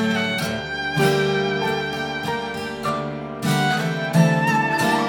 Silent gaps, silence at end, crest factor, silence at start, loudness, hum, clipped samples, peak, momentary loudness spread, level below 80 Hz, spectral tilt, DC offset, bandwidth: none; 0 s; 16 dB; 0 s; -21 LUFS; none; under 0.1%; -4 dBFS; 8 LU; -52 dBFS; -5.5 dB/octave; under 0.1%; 19 kHz